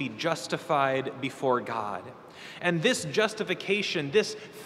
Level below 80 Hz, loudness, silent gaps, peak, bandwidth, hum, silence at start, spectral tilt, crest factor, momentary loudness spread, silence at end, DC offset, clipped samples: -74 dBFS; -28 LUFS; none; -10 dBFS; 15 kHz; none; 0 s; -4 dB/octave; 20 dB; 10 LU; 0 s; under 0.1%; under 0.1%